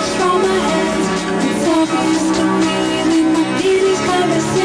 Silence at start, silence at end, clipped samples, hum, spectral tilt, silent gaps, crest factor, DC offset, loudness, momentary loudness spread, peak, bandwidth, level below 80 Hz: 0 s; 0 s; under 0.1%; none; -4.5 dB/octave; none; 10 dB; under 0.1%; -15 LUFS; 3 LU; -4 dBFS; 11 kHz; -44 dBFS